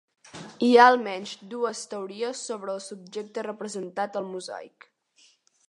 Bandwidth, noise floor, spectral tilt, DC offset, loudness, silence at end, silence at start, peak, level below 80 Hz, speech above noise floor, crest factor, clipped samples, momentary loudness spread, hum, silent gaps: 11 kHz; -62 dBFS; -3.5 dB/octave; under 0.1%; -25 LUFS; 1 s; 0.35 s; -4 dBFS; -82 dBFS; 36 dB; 24 dB; under 0.1%; 21 LU; none; none